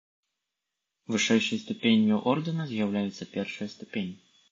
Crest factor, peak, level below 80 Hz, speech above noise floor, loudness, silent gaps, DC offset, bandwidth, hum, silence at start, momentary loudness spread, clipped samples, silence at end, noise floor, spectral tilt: 20 dB; -10 dBFS; -70 dBFS; 58 dB; -28 LUFS; none; under 0.1%; 7.6 kHz; none; 1.1 s; 12 LU; under 0.1%; 0.4 s; -85 dBFS; -5 dB/octave